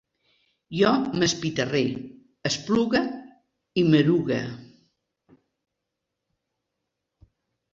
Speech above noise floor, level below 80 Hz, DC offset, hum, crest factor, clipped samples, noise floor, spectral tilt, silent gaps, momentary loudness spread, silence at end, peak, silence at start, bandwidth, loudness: 60 dB; -60 dBFS; under 0.1%; none; 20 dB; under 0.1%; -83 dBFS; -5 dB/octave; none; 17 LU; 3.1 s; -6 dBFS; 0.7 s; 7.8 kHz; -24 LUFS